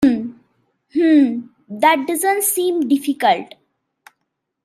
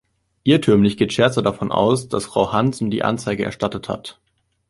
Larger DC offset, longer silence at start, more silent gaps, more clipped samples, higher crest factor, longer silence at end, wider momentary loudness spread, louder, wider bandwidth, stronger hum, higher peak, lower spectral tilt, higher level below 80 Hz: neither; second, 0 s vs 0.45 s; neither; neither; about the same, 16 dB vs 18 dB; first, 1.2 s vs 0.6 s; first, 15 LU vs 9 LU; about the same, -17 LUFS vs -19 LUFS; first, 16 kHz vs 11.5 kHz; neither; about the same, -2 dBFS vs -2 dBFS; second, -3 dB/octave vs -6 dB/octave; second, -60 dBFS vs -50 dBFS